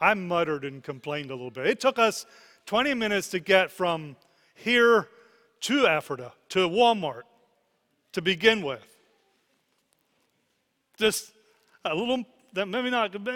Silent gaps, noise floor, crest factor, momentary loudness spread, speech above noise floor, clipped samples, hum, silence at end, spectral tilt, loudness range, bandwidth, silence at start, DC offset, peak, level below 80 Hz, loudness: none; -74 dBFS; 22 dB; 15 LU; 49 dB; under 0.1%; none; 0 s; -3.5 dB/octave; 7 LU; 17.5 kHz; 0 s; under 0.1%; -4 dBFS; -66 dBFS; -25 LUFS